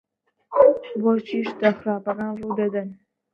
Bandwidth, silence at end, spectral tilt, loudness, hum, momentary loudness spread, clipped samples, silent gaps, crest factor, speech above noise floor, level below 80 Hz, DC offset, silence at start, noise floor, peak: 6.2 kHz; 0.4 s; -8.5 dB/octave; -22 LUFS; none; 11 LU; under 0.1%; none; 20 dB; 23 dB; -64 dBFS; under 0.1%; 0.5 s; -46 dBFS; -2 dBFS